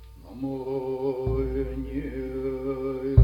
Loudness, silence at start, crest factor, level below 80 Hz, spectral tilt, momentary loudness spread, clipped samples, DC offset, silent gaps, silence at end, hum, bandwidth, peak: -30 LUFS; 0 s; 22 dB; -38 dBFS; -10.5 dB/octave; 5 LU; under 0.1%; under 0.1%; none; 0 s; none; 16 kHz; -4 dBFS